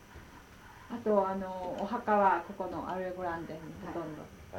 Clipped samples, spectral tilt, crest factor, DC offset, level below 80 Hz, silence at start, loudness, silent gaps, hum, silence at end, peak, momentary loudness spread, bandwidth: under 0.1%; -7 dB/octave; 20 dB; under 0.1%; -60 dBFS; 0 s; -33 LUFS; none; none; 0 s; -14 dBFS; 25 LU; 17 kHz